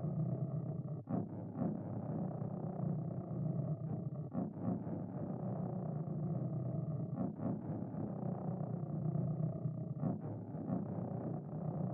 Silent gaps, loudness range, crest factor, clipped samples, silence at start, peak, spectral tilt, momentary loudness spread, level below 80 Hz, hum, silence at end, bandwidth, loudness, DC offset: none; 1 LU; 16 dB; under 0.1%; 0 s; -24 dBFS; -11.5 dB/octave; 4 LU; -72 dBFS; none; 0 s; 2.2 kHz; -41 LUFS; under 0.1%